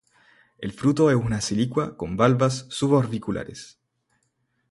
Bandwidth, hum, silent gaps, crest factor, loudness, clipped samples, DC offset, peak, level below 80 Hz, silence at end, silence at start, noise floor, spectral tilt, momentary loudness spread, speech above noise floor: 11.5 kHz; none; none; 20 dB; -23 LUFS; under 0.1%; under 0.1%; -4 dBFS; -52 dBFS; 1.05 s; 0.6 s; -72 dBFS; -6 dB/octave; 15 LU; 49 dB